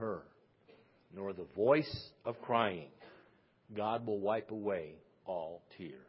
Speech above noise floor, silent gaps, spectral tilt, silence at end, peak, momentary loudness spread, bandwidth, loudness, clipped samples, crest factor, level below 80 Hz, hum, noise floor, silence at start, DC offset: 31 dB; none; -4.5 dB/octave; 0.05 s; -16 dBFS; 19 LU; 5.6 kHz; -37 LUFS; under 0.1%; 24 dB; -70 dBFS; none; -68 dBFS; 0 s; under 0.1%